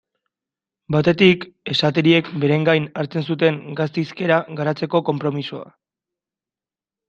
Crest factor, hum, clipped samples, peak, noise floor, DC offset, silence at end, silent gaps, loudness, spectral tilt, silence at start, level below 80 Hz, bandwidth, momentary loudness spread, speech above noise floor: 18 dB; none; under 0.1%; -2 dBFS; under -90 dBFS; under 0.1%; 1.45 s; none; -19 LUFS; -7 dB/octave; 0.9 s; -60 dBFS; 7.6 kHz; 9 LU; over 71 dB